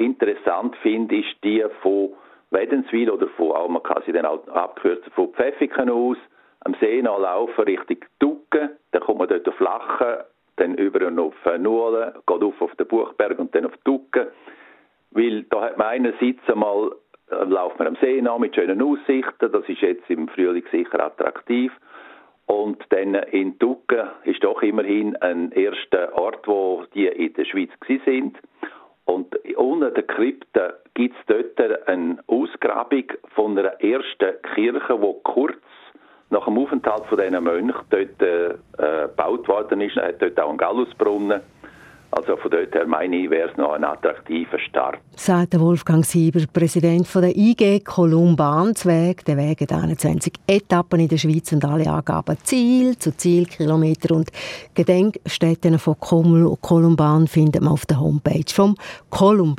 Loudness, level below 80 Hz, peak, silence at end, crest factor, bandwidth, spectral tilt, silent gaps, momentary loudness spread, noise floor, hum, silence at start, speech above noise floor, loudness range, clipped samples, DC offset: -20 LUFS; -56 dBFS; -2 dBFS; 0 s; 18 dB; 14.5 kHz; -7 dB/octave; none; 7 LU; -53 dBFS; none; 0 s; 33 dB; 6 LU; under 0.1%; under 0.1%